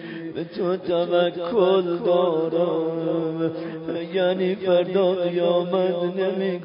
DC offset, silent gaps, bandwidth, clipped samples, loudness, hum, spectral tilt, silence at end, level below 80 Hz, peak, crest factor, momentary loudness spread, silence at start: under 0.1%; none; 5.4 kHz; under 0.1%; -23 LUFS; none; -11 dB/octave; 0 s; -68 dBFS; -8 dBFS; 14 dB; 7 LU; 0 s